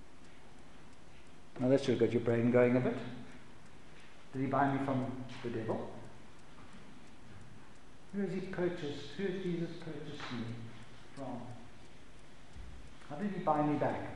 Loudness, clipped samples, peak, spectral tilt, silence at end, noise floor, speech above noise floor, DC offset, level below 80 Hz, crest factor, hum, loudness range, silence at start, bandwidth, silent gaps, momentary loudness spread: -35 LUFS; under 0.1%; -16 dBFS; -7.5 dB/octave; 0 s; -58 dBFS; 24 dB; 0.5%; -64 dBFS; 22 dB; none; 12 LU; 0 s; 11.5 kHz; none; 26 LU